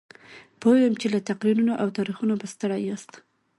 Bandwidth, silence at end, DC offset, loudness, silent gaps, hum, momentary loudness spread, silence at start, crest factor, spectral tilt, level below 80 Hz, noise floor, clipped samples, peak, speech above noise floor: 11.5 kHz; 0.55 s; under 0.1%; -24 LUFS; none; none; 9 LU; 0.3 s; 16 dB; -6 dB/octave; -70 dBFS; -49 dBFS; under 0.1%; -8 dBFS; 26 dB